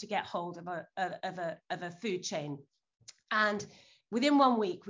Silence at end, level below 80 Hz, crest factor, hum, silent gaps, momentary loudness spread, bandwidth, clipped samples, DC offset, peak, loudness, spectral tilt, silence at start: 0 s; -80 dBFS; 20 dB; none; none; 15 LU; 7.6 kHz; under 0.1%; under 0.1%; -14 dBFS; -33 LUFS; -4.5 dB/octave; 0 s